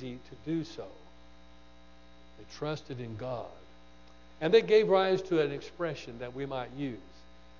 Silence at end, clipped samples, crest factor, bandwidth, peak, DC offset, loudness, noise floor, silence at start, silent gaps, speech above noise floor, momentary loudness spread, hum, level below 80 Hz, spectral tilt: 0.5 s; under 0.1%; 22 dB; 7.2 kHz; -10 dBFS; 0.2%; -31 LUFS; -57 dBFS; 0 s; none; 26 dB; 20 LU; none; -60 dBFS; -6.5 dB/octave